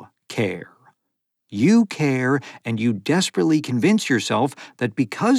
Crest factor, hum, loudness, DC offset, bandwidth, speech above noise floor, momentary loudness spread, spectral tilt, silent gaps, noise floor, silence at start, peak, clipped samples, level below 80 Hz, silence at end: 16 dB; none; -21 LUFS; under 0.1%; 13.5 kHz; 58 dB; 10 LU; -5.5 dB/octave; none; -78 dBFS; 0 s; -6 dBFS; under 0.1%; -76 dBFS; 0 s